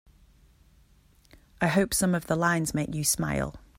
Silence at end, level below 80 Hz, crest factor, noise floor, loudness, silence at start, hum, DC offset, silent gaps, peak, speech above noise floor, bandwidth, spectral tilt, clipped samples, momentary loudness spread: 0.2 s; -50 dBFS; 18 dB; -60 dBFS; -26 LUFS; 1.6 s; none; under 0.1%; none; -10 dBFS; 34 dB; 16.5 kHz; -4.5 dB/octave; under 0.1%; 6 LU